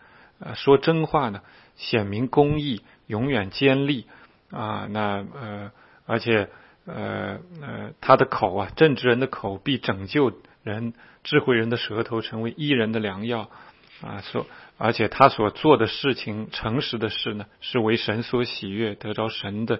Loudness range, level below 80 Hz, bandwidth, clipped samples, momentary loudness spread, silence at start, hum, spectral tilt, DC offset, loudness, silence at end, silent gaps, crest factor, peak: 5 LU; -54 dBFS; 5.8 kHz; under 0.1%; 17 LU; 0.4 s; none; -9 dB/octave; under 0.1%; -24 LUFS; 0 s; none; 24 dB; 0 dBFS